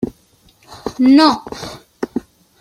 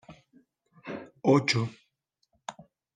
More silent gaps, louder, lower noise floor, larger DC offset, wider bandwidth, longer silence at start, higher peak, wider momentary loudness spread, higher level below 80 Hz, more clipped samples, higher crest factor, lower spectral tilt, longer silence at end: neither; first, -14 LUFS vs -26 LUFS; second, -53 dBFS vs -76 dBFS; neither; first, 11.5 kHz vs 9.6 kHz; about the same, 0 s vs 0.1 s; first, -2 dBFS vs -10 dBFS; about the same, 20 LU vs 21 LU; first, -50 dBFS vs -72 dBFS; neither; second, 16 dB vs 22 dB; about the same, -4.5 dB/octave vs -5.5 dB/octave; about the same, 0.4 s vs 0.35 s